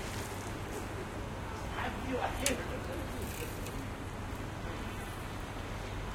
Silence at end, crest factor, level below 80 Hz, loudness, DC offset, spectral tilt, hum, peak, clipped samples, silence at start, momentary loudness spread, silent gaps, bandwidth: 0 s; 26 dB; -46 dBFS; -39 LUFS; under 0.1%; -4.5 dB/octave; none; -12 dBFS; under 0.1%; 0 s; 8 LU; none; 16.5 kHz